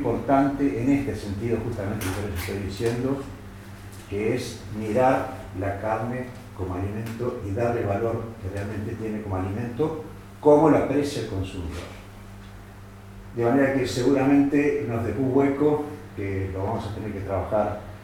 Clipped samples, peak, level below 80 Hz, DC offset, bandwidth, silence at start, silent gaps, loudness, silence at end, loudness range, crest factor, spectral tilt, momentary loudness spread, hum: under 0.1%; -4 dBFS; -46 dBFS; under 0.1%; 17 kHz; 0 s; none; -25 LUFS; 0 s; 6 LU; 22 dB; -7 dB/octave; 19 LU; none